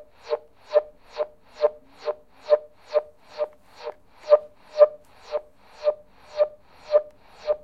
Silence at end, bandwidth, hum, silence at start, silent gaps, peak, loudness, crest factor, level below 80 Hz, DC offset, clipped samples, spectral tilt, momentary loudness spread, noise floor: 0.05 s; 6.2 kHz; none; 0.25 s; none; -2 dBFS; -26 LUFS; 24 dB; -64 dBFS; 0.2%; under 0.1%; -3.5 dB/octave; 19 LU; -40 dBFS